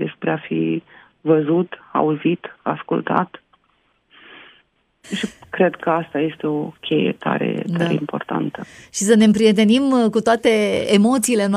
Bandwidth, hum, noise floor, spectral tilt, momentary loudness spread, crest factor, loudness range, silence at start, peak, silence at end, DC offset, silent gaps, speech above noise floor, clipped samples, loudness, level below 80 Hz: 15 kHz; none; -63 dBFS; -5 dB/octave; 12 LU; 18 dB; 8 LU; 0 s; 0 dBFS; 0 s; under 0.1%; none; 45 dB; under 0.1%; -19 LUFS; -60 dBFS